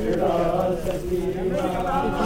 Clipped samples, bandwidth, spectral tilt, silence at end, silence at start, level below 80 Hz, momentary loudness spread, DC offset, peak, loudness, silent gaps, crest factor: under 0.1%; 16 kHz; -7 dB/octave; 0 s; 0 s; -36 dBFS; 4 LU; under 0.1%; -10 dBFS; -24 LUFS; none; 14 dB